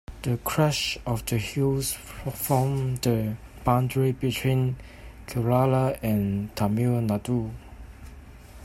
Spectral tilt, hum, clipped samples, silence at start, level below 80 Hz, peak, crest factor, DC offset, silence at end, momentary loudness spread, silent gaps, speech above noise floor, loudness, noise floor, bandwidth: -6 dB/octave; none; under 0.1%; 0.1 s; -46 dBFS; -6 dBFS; 20 dB; under 0.1%; 0 s; 15 LU; none; 20 dB; -26 LUFS; -45 dBFS; 16 kHz